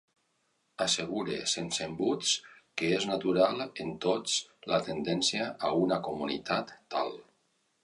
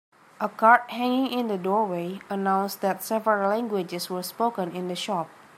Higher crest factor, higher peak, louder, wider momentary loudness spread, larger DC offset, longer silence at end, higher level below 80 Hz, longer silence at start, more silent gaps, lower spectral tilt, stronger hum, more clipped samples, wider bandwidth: about the same, 20 dB vs 22 dB; second, -12 dBFS vs -4 dBFS; second, -31 LUFS vs -25 LUFS; second, 7 LU vs 11 LU; neither; first, 0.6 s vs 0.3 s; first, -68 dBFS vs -80 dBFS; first, 0.8 s vs 0.4 s; neither; second, -3 dB/octave vs -5 dB/octave; neither; neither; second, 11.5 kHz vs 16 kHz